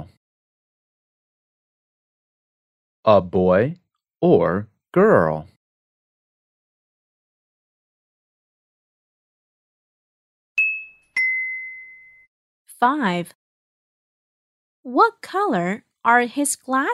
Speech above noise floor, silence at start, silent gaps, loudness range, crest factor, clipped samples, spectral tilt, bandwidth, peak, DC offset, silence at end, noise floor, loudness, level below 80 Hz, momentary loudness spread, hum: 26 dB; 0 s; 0.17-3.03 s, 5.56-10.55 s, 12.27-12.65 s, 13.35-14.83 s; 8 LU; 22 dB; under 0.1%; -5.5 dB/octave; 14 kHz; -2 dBFS; under 0.1%; 0 s; -44 dBFS; -20 LUFS; -64 dBFS; 11 LU; none